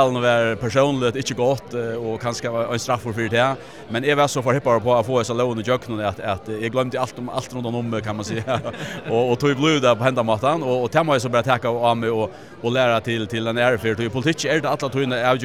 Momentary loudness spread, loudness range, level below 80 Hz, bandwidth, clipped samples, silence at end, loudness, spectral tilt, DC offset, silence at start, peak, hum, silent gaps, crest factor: 8 LU; 5 LU; -56 dBFS; 15.5 kHz; under 0.1%; 0 s; -21 LUFS; -5 dB/octave; 0.3%; 0 s; -2 dBFS; none; none; 18 dB